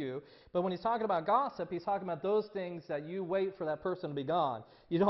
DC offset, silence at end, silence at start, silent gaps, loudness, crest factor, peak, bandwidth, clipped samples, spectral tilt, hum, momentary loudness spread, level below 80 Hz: under 0.1%; 0 s; 0 s; none; -35 LUFS; 20 dB; -14 dBFS; 6 kHz; under 0.1%; -5.5 dB/octave; none; 9 LU; -70 dBFS